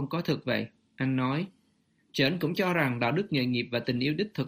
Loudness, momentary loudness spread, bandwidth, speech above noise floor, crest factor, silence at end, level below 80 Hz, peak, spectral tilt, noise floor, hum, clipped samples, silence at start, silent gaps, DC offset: -29 LUFS; 7 LU; 15.5 kHz; 41 dB; 16 dB; 0 s; -66 dBFS; -12 dBFS; -6.5 dB/octave; -69 dBFS; none; under 0.1%; 0 s; none; under 0.1%